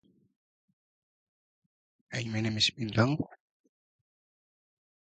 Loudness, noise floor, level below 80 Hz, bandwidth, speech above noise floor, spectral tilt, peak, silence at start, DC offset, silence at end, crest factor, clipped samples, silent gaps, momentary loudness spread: -30 LUFS; under -90 dBFS; -64 dBFS; 9 kHz; over 60 dB; -4.5 dB/octave; -12 dBFS; 2.1 s; under 0.1%; 1.85 s; 24 dB; under 0.1%; none; 12 LU